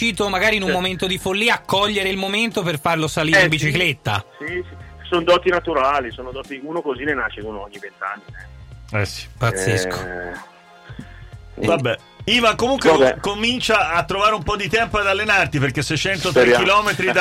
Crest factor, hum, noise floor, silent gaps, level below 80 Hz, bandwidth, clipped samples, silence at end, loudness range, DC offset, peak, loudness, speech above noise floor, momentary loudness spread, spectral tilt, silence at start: 14 dB; none; -39 dBFS; none; -42 dBFS; 16.5 kHz; under 0.1%; 0 s; 8 LU; under 0.1%; -4 dBFS; -18 LUFS; 19 dB; 16 LU; -4 dB/octave; 0 s